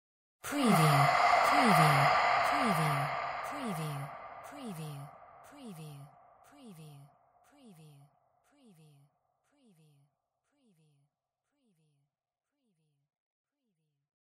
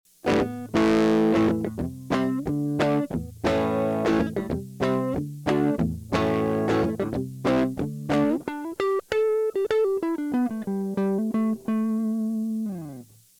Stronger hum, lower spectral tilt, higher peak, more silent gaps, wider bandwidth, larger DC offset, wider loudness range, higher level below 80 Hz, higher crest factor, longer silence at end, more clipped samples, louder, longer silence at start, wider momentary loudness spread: neither; second, -5 dB/octave vs -7 dB/octave; second, -14 dBFS vs -10 dBFS; neither; about the same, 16 kHz vs 17 kHz; neither; first, 26 LU vs 2 LU; second, -70 dBFS vs -48 dBFS; about the same, 20 dB vs 16 dB; first, 7.4 s vs 0.35 s; neither; second, -28 LUFS vs -25 LUFS; first, 0.45 s vs 0.25 s; first, 23 LU vs 7 LU